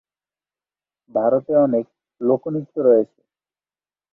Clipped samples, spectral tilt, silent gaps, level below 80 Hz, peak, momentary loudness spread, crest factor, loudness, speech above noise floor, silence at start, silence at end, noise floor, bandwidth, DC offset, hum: under 0.1%; -12.5 dB/octave; none; -66 dBFS; -4 dBFS; 10 LU; 18 dB; -19 LUFS; over 72 dB; 1.15 s; 1.1 s; under -90 dBFS; 2.5 kHz; under 0.1%; none